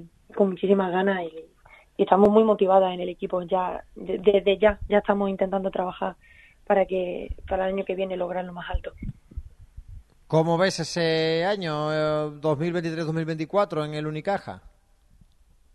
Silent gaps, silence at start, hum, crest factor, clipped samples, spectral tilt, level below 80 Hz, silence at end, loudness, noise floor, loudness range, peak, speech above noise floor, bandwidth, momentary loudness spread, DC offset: none; 0 s; none; 22 dB; under 0.1%; -6.5 dB/octave; -44 dBFS; 1.05 s; -24 LUFS; -58 dBFS; 6 LU; -2 dBFS; 35 dB; 11.5 kHz; 15 LU; under 0.1%